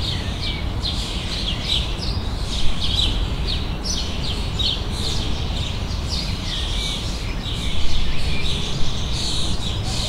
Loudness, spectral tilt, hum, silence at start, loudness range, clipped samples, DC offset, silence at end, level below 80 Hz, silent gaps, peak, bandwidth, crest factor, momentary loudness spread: -24 LUFS; -4 dB/octave; none; 0 s; 2 LU; under 0.1%; under 0.1%; 0 s; -26 dBFS; none; -4 dBFS; 13 kHz; 16 dB; 4 LU